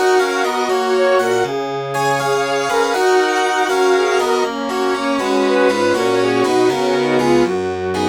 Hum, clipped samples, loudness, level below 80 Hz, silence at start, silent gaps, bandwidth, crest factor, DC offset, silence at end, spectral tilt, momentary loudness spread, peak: none; under 0.1%; -16 LUFS; -54 dBFS; 0 s; none; 17 kHz; 14 dB; under 0.1%; 0 s; -4 dB/octave; 4 LU; -2 dBFS